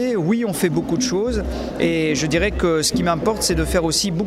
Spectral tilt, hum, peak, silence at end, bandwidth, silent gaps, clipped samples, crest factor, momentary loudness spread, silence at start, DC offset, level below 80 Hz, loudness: -4.5 dB/octave; none; -6 dBFS; 0 s; 16 kHz; none; under 0.1%; 14 dB; 4 LU; 0 s; under 0.1%; -32 dBFS; -19 LUFS